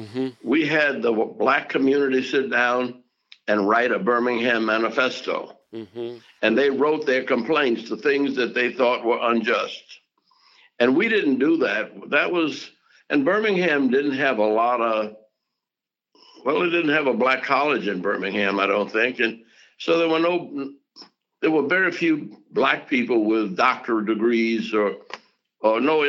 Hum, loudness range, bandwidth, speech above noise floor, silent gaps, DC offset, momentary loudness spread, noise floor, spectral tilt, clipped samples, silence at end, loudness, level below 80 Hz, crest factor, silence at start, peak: none; 2 LU; 7.4 kHz; 66 dB; none; under 0.1%; 10 LU; -88 dBFS; -5.5 dB/octave; under 0.1%; 0 s; -21 LUFS; -76 dBFS; 18 dB; 0 s; -4 dBFS